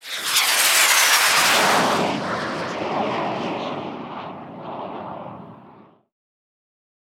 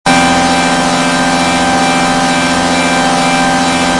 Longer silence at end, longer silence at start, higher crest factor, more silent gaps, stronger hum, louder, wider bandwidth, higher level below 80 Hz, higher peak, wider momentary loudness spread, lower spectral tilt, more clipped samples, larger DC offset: first, 1.45 s vs 0 s; about the same, 0.05 s vs 0.05 s; first, 20 dB vs 10 dB; neither; neither; second, -18 LUFS vs -10 LUFS; first, 18 kHz vs 11.5 kHz; second, -66 dBFS vs -36 dBFS; about the same, -2 dBFS vs 0 dBFS; first, 20 LU vs 2 LU; second, -1 dB/octave vs -3.5 dB/octave; neither; neither